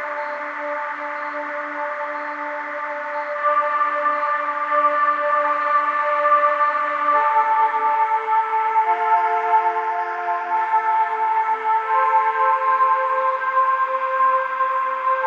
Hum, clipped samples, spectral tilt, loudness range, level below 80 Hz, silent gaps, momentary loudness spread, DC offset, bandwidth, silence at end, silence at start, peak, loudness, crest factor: none; under 0.1%; -2.5 dB/octave; 5 LU; under -90 dBFS; none; 9 LU; under 0.1%; 7.4 kHz; 0 s; 0 s; -6 dBFS; -20 LUFS; 14 dB